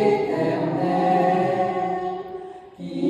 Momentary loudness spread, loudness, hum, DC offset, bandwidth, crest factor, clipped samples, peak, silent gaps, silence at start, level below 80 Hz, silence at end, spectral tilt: 16 LU; -22 LUFS; none; under 0.1%; 10 kHz; 14 dB; under 0.1%; -8 dBFS; none; 0 s; -60 dBFS; 0 s; -8 dB/octave